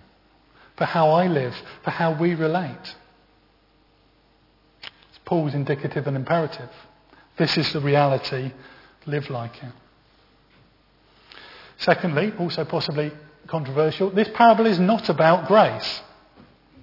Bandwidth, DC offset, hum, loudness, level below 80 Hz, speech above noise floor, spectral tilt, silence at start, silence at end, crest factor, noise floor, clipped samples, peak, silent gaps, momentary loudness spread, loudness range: 5.8 kHz; under 0.1%; none; -22 LUFS; -62 dBFS; 38 dB; -7.5 dB/octave; 0.8 s; 0.8 s; 22 dB; -59 dBFS; under 0.1%; -2 dBFS; none; 22 LU; 11 LU